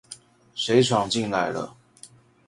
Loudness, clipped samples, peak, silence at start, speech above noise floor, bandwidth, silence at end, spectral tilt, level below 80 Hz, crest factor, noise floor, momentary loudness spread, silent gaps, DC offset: -23 LUFS; under 0.1%; -4 dBFS; 0.1 s; 28 dB; 11.5 kHz; 0.4 s; -4.5 dB/octave; -60 dBFS; 22 dB; -51 dBFS; 20 LU; none; under 0.1%